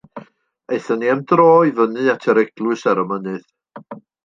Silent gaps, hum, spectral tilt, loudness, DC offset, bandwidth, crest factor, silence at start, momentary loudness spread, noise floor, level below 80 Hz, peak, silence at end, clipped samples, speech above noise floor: none; none; -7 dB/octave; -17 LUFS; under 0.1%; 7.4 kHz; 16 dB; 0.15 s; 17 LU; -47 dBFS; -68 dBFS; -2 dBFS; 0.25 s; under 0.1%; 31 dB